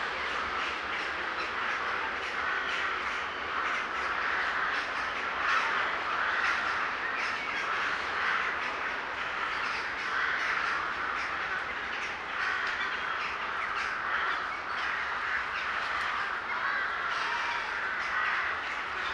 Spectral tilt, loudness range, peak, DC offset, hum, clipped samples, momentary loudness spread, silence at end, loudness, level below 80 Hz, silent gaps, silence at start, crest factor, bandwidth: -2 dB/octave; 2 LU; -14 dBFS; under 0.1%; none; under 0.1%; 4 LU; 0 s; -30 LUFS; -60 dBFS; none; 0 s; 18 dB; 12 kHz